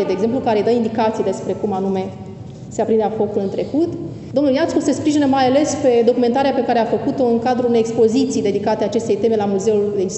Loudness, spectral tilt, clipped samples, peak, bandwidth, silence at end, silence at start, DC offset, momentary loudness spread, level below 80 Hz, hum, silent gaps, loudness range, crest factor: -17 LUFS; -6 dB/octave; under 0.1%; -2 dBFS; 8.4 kHz; 0 s; 0 s; under 0.1%; 7 LU; -54 dBFS; none; none; 4 LU; 14 dB